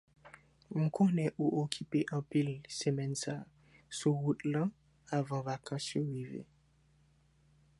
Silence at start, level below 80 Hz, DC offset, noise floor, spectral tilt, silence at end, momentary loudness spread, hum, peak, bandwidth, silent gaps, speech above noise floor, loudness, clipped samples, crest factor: 0.25 s; -72 dBFS; under 0.1%; -68 dBFS; -6 dB/octave; 1.35 s; 11 LU; none; -14 dBFS; 11.5 kHz; none; 34 dB; -35 LUFS; under 0.1%; 22 dB